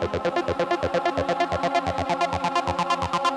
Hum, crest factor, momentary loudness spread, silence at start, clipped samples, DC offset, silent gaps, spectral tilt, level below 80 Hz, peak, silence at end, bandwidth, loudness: none; 16 dB; 2 LU; 0 s; under 0.1%; under 0.1%; none; -5 dB/octave; -46 dBFS; -8 dBFS; 0 s; 12.5 kHz; -24 LUFS